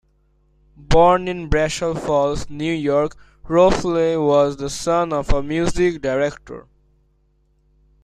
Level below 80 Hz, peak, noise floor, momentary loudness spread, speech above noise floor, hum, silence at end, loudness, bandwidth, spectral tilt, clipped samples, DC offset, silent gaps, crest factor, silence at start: -32 dBFS; -2 dBFS; -61 dBFS; 9 LU; 43 dB; none; 1.45 s; -19 LUFS; 12.5 kHz; -5.5 dB/octave; under 0.1%; under 0.1%; none; 18 dB; 0.8 s